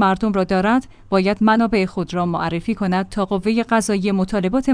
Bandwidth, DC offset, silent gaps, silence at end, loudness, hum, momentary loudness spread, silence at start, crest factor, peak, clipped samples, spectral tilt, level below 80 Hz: 10.5 kHz; under 0.1%; none; 0 s; -19 LUFS; none; 6 LU; 0 s; 14 dB; -4 dBFS; under 0.1%; -6 dB/octave; -42 dBFS